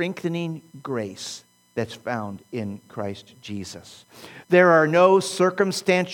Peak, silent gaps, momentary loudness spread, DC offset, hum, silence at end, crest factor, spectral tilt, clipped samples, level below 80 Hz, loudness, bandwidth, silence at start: -2 dBFS; none; 21 LU; under 0.1%; none; 0 s; 20 dB; -5 dB/octave; under 0.1%; -70 dBFS; -22 LUFS; 18 kHz; 0 s